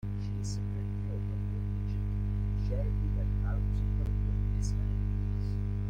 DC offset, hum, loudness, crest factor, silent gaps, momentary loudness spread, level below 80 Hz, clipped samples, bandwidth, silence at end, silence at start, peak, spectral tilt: under 0.1%; 50 Hz at -30 dBFS; -34 LUFS; 10 dB; none; 3 LU; -34 dBFS; under 0.1%; 8.8 kHz; 0 s; 0.05 s; -20 dBFS; -8 dB/octave